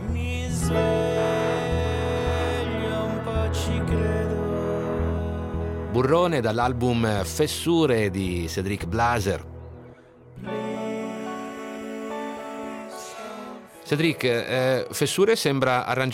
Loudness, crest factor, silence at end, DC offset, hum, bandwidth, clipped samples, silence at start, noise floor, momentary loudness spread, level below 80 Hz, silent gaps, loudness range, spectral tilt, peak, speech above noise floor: -25 LUFS; 16 dB; 0 s; under 0.1%; none; 16.5 kHz; under 0.1%; 0 s; -48 dBFS; 13 LU; -42 dBFS; none; 10 LU; -5.5 dB/octave; -8 dBFS; 25 dB